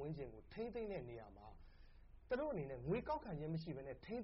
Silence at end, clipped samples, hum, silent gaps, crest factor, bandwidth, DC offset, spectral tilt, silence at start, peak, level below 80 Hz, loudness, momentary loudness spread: 0 s; under 0.1%; none; none; 16 dB; 5.6 kHz; under 0.1%; -6.5 dB/octave; 0 s; -32 dBFS; -62 dBFS; -47 LUFS; 16 LU